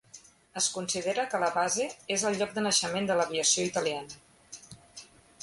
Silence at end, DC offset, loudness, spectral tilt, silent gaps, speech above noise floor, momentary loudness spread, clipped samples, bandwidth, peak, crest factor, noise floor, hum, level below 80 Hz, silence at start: 0.4 s; under 0.1%; -28 LUFS; -2 dB/octave; none; 25 dB; 22 LU; under 0.1%; 11.5 kHz; -10 dBFS; 20 dB; -55 dBFS; none; -68 dBFS; 0.15 s